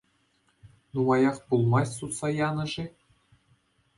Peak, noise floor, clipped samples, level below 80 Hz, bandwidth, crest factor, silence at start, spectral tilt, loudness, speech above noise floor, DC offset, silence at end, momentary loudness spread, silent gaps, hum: -12 dBFS; -69 dBFS; under 0.1%; -60 dBFS; 11.5 kHz; 18 dB; 0.65 s; -6.5 dB/octave; -27 LUFS; 43 dB; under 0.1%; 1.1 s; 12 LU; none; none